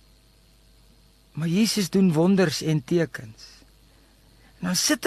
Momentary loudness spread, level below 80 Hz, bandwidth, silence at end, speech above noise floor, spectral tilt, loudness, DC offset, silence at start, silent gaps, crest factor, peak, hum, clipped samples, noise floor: 16 LU; -58 dBFS; 13 kHz; 0 s; 34 dB; -4.5 dB/octave; -23 LUFS; under 0.1%; 1.35 s; none; 18 dB; -8 dBFS; none; under 0.1%; -57 dBFS